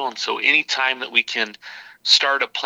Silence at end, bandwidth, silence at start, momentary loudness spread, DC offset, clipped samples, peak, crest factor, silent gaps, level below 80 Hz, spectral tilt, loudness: 0 s; 16.5 kHz; 0 s; 12 LU; under 0.1%; under 0.1%; 0 dBFS; 20 dB; none; -80 dBFS; 0.5 dB/octave; -18 LUFS